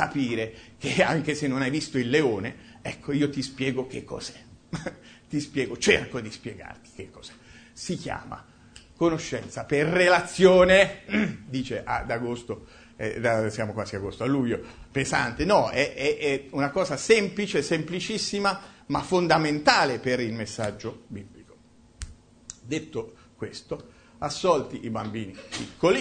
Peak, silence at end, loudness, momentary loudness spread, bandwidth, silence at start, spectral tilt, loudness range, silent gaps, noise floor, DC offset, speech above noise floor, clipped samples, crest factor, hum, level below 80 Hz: -4 dBFS; 0 s; -25 LUFS; 18 LU; 9.6 kHz; 0 s; -4.5 dB/octave; 11 LU; none; -55 dBFS; under 0.1%; 29 dB; under 0.1%; 22 dB; none; -52 dBFS